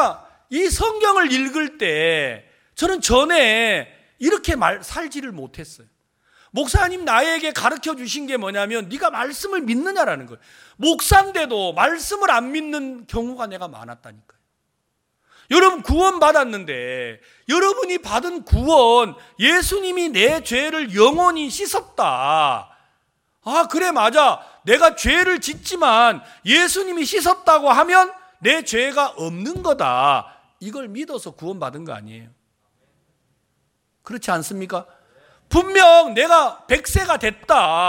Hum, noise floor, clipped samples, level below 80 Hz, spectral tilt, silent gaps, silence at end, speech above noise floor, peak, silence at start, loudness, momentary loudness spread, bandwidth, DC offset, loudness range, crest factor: none; -72 dBFS; under 0.1%; -36 dBFS; -3.5 dB/octave; none; 0 s; 54 dB; 0 dBFS; 0 s; -17 LUFS; 16 LU; 17 kHz; under 0.1%; 9 LU; 18 dB